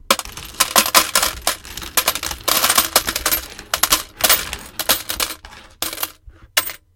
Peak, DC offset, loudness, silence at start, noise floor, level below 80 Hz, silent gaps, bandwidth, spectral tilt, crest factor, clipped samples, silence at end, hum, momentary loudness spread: 0 dBFS; under 0.1%; -17 LUFS; 0.1 s; -43 dBFS; -42 dBFS; none; over 20 kHz; 0 dB/octave; 20 dB; under 0.1%; 0.2 s; none; 13 LU